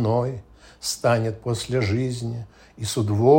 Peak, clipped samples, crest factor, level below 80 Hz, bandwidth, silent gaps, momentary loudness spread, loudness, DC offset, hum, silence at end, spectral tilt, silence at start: -4 dBFS; under 0.1%; 18 dB; -52 dBFS; 16.5 kHz; none; 12 LU; -25 LUFS; under 0.1%; none; 0 s; -6 dB/octave; 0 s